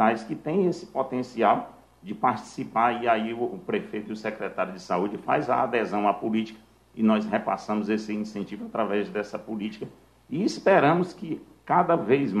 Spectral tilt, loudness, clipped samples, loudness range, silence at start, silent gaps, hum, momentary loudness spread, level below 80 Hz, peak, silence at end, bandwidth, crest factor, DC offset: -6.5 dB/octave; -26 LUFS; under 0.1%; 2 LU; 0 s; none; none; 13 LU; -64 dBFS; -6 dBFS; 0 s; 11.5 kHz; 20 dB; under 0.1%